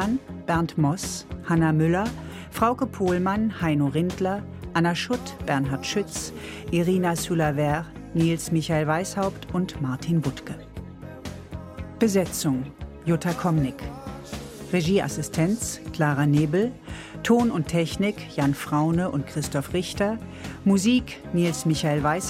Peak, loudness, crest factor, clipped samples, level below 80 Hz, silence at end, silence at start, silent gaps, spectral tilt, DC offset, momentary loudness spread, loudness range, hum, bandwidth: -6 dBFS; -25 LUFS; 18 dB; under 0.1%; -46 dBFS; 0 s; 0 s; none; -5.5 dB/octave; under 0.1%; 15 LU; 4 LU; none; 16 kHz